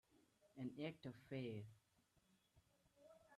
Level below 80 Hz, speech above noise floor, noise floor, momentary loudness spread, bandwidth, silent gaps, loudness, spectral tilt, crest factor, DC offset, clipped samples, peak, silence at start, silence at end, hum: -86 dBFS; 29 dB; -81 dBFS; 11 LU; 13 kHz; none; -53 LUFS; -7.5 dB/octave; 20 dB; under 0.1%; under 0.1%; -36 dBFS; 0.15 s; 0 s; none